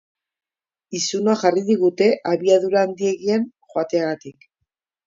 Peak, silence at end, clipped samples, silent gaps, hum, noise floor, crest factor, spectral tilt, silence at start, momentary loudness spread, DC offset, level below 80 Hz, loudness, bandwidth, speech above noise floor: -4 dBFS; 0.75 s; under 0.1%; none; none; -79 dBFS; 18 dB; -4.5 dB/octave; 0.9 s; 10 LU; under 0.1%; -70 dBFS; -20 LUFS; 7.8 kHz; 60 dB